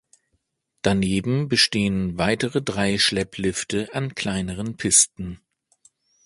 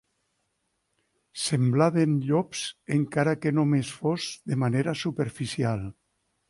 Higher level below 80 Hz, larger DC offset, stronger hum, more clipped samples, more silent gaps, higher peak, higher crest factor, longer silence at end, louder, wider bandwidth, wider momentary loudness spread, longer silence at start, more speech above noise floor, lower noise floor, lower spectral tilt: first, -48 dBFS vs -60 dBFS; neither; neither; neither; neither; first, -2 dBFS vs -10 dBFS; about the same, 20 dB vs 18 dB; first, 0.9 s vs 0.6 s; first, -21 LUFS vs -26 LUFS; about the same, 11.5 kHz vs 11.5 kHz; about the same, 11 LU vs 9 LU; second, 0.85 s vs 1.35 s; about the same, 50 dB vs 51 dB; about the same, -73 dBFS vs -76 dBFS; second, -3 dB/octave vs -6 dB/octave